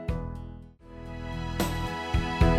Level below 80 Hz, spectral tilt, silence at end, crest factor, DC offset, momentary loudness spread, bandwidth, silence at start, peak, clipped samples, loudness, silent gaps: -34 dBFS; -6 dB/octave; 0 s; 18 dB; under 0.1%; 16 LU; 16 kHz; 0 s; -10 dBFS; under 0.1%; -32 LUFS; none